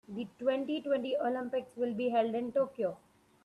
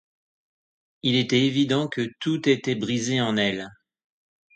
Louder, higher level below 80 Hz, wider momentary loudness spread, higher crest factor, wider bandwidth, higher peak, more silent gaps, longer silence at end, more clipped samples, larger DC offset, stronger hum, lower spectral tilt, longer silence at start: second, -34 LUFS vs -24 LUFS; second, -78 dBFS vs -64 dBFS; about the same, 6 LU vs 8 LU; about the same, 14 dB vs 18 dB; first, 11 kHz vs 9.2 kHz; second, -18 dBFS vs -8 dBFS; neither; second, 0.45 s vs 0.85 s; neither; neither; neither; first, -6.5 dB/octave vs -5 dB/octave; second, 0.1 s vs 1.05 s